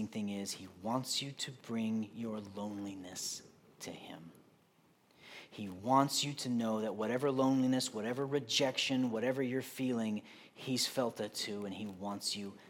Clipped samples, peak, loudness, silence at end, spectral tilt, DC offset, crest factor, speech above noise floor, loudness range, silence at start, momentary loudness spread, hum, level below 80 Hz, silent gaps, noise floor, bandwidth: under 0.1%; -16 dBFS; -36 LUFS; 0 s; -4 dB/octave; under 0.1%; 22 dB; 33 dB; 10 LU; 0 s; 15 LU; none; -84 dBFS; none; -69 dBFS; 17 kHz